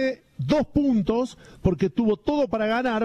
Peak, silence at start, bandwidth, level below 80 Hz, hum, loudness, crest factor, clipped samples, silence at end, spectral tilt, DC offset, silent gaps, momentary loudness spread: -10 dBFS; 0 s; 9.6 kHz; -44 dBFS; none; -24 LUFS; 14 dB; under 0.1%; 0 s; -7.5 dB/octave; under 0.1%; none; 6 LU